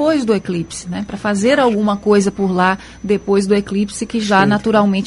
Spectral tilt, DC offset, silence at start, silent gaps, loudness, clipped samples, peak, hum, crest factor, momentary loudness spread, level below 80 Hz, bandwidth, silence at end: -5.5 dB/octave; under 0.1%; 0 s; none; -16 LUFS; under 0.1%; 0 dBFS; none; 14 dB; 9 LU; -44 dBFS; 11.5 kHz; 0 s